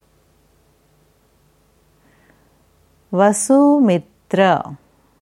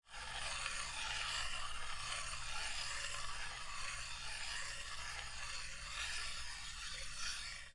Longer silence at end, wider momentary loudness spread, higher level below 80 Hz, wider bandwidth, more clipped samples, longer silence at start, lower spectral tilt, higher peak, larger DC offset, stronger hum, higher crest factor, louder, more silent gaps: first, 0.45 s vs 0 s; first, 11 LU vs 5 LU; second, -62 dBFS vs -54 dBFS; first, 13 kHz vs 11.5 kHz; neither; first, 3.1 s vs 0.05 s; first, -5.5 dB/octave vs 0 dB/octave; first, 0 dBFS vs -26 dBFS; neither; neither; about the same, 18 dB vs 18 dB; first, -15 LUFS vs -43 LUFS; neither